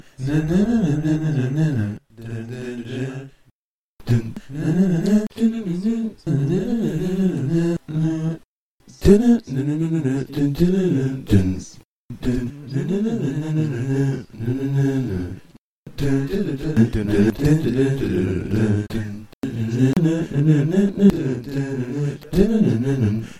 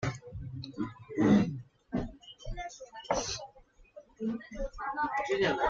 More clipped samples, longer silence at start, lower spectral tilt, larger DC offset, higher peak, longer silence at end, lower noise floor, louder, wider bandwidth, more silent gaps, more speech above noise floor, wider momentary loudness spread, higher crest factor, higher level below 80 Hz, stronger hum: neither; first, 0.2 s vs 0 s; first, -8 dB/octave vs -5.5 dB/octave; neither; first, 0 dBFS vs -14 dBFS; about the same, 0 s vs 0 s; first, -68 dBFS vs -59 dBFS; first, -21 LUFS vs -33 LUFS; first, 14.5 kHz vs 7.6 kHz; first, 3.51-3.97 s, 8.45-8.79 s, 11.85-12.09 s, 15.58-15.85 s, 19.34-19.42 s vs none; first, 49 dB vs 27 dB; second, 12 LU vs 18 LU; about the same, 20 dB vs 20 dB; first, -38 dBFS vs -50 dBFS; neither